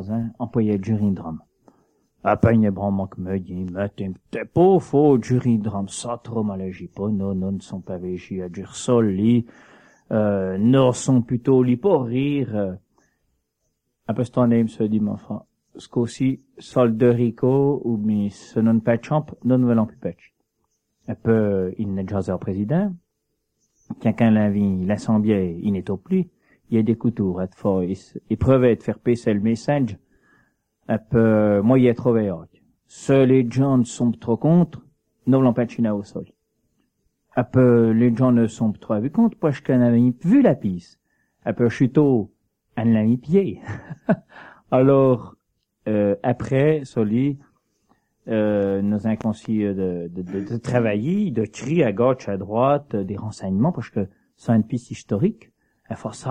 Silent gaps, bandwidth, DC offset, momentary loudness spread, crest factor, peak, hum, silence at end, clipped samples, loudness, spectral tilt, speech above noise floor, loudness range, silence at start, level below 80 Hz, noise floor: none; 9.8 kHz; under 0.1%; 13 LU; 18 dB; -2 dBFS; none; 0 s; under 0.1%; -21 LUFS; -8 dB/octave; 55 dB; 5 LU; 0 s; -54 dBFS; -75 dBFS